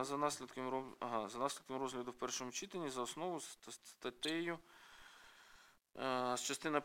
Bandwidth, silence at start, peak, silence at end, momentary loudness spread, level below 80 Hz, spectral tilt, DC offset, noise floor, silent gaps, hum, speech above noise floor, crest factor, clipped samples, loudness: 16.5 kHz; 0 s; -18 dBFS; 0 s; 20 LU; -78 dBFS; -3 dB/octave; under 0.1%; -66 dBFS; none; none; 24 dB; 24 dB; under 0.1%; -43 LUFS